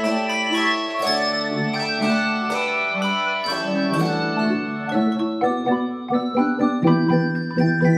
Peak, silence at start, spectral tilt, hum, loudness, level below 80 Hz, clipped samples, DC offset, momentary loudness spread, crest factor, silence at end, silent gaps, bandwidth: -4 dBFS; 0 s; -5.5 dB/octave; none; -21 LUFS; -64 dBFS; under 0.1%; under 0.1%; 4 LU; 16 dB; 0 s; none; 14 kHz